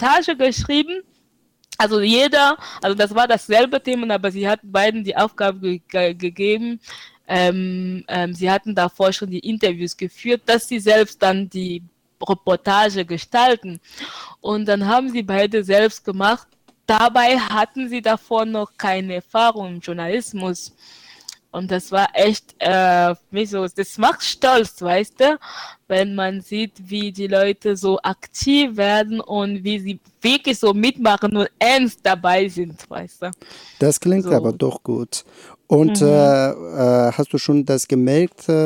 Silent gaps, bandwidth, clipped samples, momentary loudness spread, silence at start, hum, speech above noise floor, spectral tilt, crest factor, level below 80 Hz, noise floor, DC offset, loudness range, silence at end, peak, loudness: none; 18 kHz; under 0.1%; 13 LU; 0 s; none; 44 dB; -4.5 dB/octave; 18 dB; -52 dBFS; -63 dBFS; under 0.1%; 4 LU; 0 s; 0 dBFS; -18 LUFS